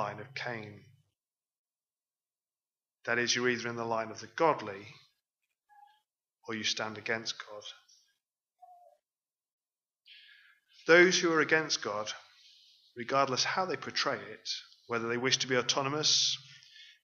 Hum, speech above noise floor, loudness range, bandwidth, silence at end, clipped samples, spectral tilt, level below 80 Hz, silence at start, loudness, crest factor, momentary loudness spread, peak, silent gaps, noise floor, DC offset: none; over 59 dB; 10 LU; 7.4 kHz; 0.2 s; under 0.1%; -2.5 dB/octave; -84 dBFS; 0 s; -30 LUFS; 26 dB; 18 LU; -8 dBFS; 1.58-1.65 s, 9.51-9.59 s; under -90 dBFS; under 0.1%